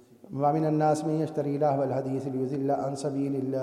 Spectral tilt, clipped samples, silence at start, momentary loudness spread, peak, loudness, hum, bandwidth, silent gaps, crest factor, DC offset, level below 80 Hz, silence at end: -8 dB/octave; under 0.1%; 0.3 s; 6 LU; -12 dBFS; -28 LUFS; none; 13 kHz; none; 14 dB; under 0.1%; -70 dBFS; 0 s